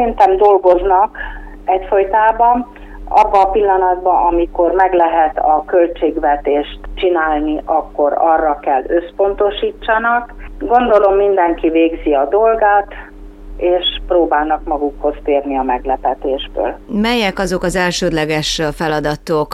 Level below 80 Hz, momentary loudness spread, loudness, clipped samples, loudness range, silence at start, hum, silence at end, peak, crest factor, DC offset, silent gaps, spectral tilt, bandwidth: -32 dBFS; 8 LU; -14 LUFS; under 0.1%; 4 LU; 0 s; none; 0 s; -2 dBFS; 12 dB; under 0.1%; none; -5 dB/octave; 13.5 kHz